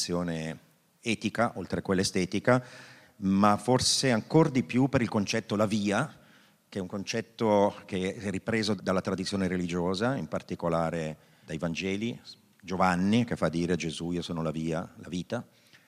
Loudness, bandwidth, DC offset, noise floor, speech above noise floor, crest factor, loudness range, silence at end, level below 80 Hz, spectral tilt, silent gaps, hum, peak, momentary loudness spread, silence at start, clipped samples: -29 LUFS; 15 kHz; under 0.1%; -60 dBFS; 31 dB; 20 dB; 5 LU; 0.45 s; -62 dBFS; -5 dB/octave; none; none; -8 dBFS; 13 LU; 0 s; under 0.1%